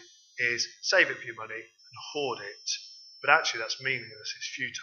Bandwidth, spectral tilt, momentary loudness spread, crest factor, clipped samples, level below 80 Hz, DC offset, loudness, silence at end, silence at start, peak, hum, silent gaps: 7.4 kHz; -1 dB/octave; 17 LU; 26 dB; under 0.1%; -88 dBFS; under 0.1%; -29 LUFS; 0 s; 0 s; -4 dBFS; none; none